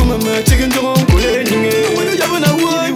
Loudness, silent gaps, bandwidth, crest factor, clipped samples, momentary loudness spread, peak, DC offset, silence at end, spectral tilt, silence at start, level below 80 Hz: -13 LUFS; none; 17 kHz; 12 dB; under 0.1%; 2 LU; 0 dBFS; under 0.1%; 0 s; -5 dB/octave; 0 s; -20 dBFS